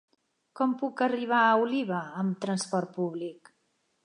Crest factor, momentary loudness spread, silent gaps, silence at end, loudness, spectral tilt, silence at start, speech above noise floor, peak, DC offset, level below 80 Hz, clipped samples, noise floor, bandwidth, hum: 18 dB; 10 LU; none; 0.7 s; -28 LUFS; -5.5 dB/octave; 0.55 s; 46 dB; -12 dBFS; under 0.1%; -84 dBFS; under 0.1%; -74 dBFS; 11 kHz; none